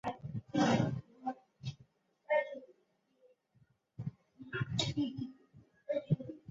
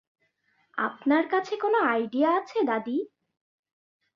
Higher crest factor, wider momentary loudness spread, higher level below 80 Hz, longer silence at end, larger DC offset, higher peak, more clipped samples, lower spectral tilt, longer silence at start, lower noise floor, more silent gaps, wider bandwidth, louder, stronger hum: about the same, 22 dB vs 18 dB; first, 16 LU vs 8 LU; first, -66 dBFS vs -78 dBFS; second, 0.15 s vs 1.1 s; neither; second, -18 dBFS vs -10 dBFS; neither; about the same, -5 dB/octave vs -5.5 dB/octave; second, 0.05 s vs 0.75 s; first, -76 dBFS vs -70 dBFS; neither; about the same, 7.4 kHz vs 7.2 kHz; second, -37 LUFS vs -26 LUFS; neither